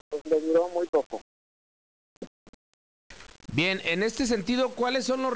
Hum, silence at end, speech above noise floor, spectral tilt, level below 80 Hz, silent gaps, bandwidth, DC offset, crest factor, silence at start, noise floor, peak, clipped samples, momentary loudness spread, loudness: none; 0 s; over 63 dB; -4.5 dB/octave; -58 dBFS; 0.21-0.25 s, 0.89-0.93 s, 1.06-1.10 s, 1.21-2.21 s, 2.27-3.10 s; 8 kHz; 0.2%; 14 dB; 0.1 s; under -90 dBFS; -14 dBFS; under 0.1%; 21 LU; -26 LUFS